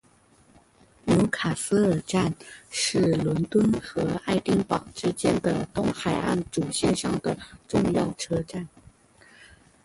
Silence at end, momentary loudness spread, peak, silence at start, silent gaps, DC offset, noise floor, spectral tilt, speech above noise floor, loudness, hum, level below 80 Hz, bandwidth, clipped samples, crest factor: 1.2 s; 7 LU; -10 dBFS; 1.05 s; none; under 0.1%; -59 dBFS; -5.5 dB/octave; 33 dB; -26 LUFS; none; -50 dBFS; 11.5 kHz; under 0.1%; 16 dB